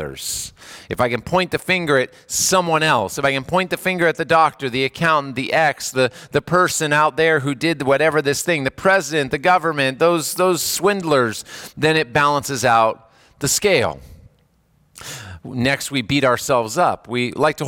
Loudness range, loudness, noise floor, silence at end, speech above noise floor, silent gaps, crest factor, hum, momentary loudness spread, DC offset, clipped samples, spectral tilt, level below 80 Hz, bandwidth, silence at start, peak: 4 LU; -18 LUFS; -59 dBFS; 0 s; 41 dB; none; 16 dB; none; 9 LU; under 0.1%; under 0.1%; -3.5 dB/octave; -52 dBFS; 18 kHz; 0 s; -4 dBFS